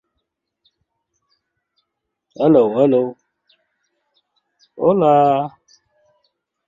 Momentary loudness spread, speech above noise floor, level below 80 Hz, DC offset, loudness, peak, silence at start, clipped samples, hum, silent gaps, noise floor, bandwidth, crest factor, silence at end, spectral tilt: 9 LU; 62 dB; -64 dBFS; under 0.1%; -16 LUFS; -2 dBFS; 2.4 s; under 0.1%; none; none; -77 dBFS; 7.4 kHz; 18 dB; 1.2 s; -9 dB/octave